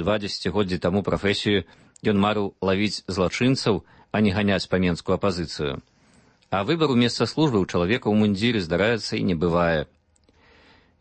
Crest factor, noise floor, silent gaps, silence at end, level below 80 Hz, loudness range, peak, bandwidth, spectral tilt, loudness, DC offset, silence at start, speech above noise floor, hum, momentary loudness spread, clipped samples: 16 dB; -60 dBFS; none; 1.15 s; -48 dBFS; 2 LU; -8 dBFS; 8.8 kHz; -6 dB/octave; -23 LUFS; under 0.1%; 0 s; 38 dB; none; 7 LU; under 0.1%